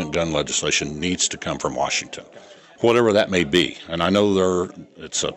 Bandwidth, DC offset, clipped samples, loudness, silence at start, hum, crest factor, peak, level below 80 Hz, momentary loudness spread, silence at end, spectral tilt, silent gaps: 12 kHz; under 0.1%; under 0.1%; -20 LUFS; 0 s; none; 16 dB; -6 dBFS; -50 dBFS; 9 LU; 0 s; -3.5 dB/octave; none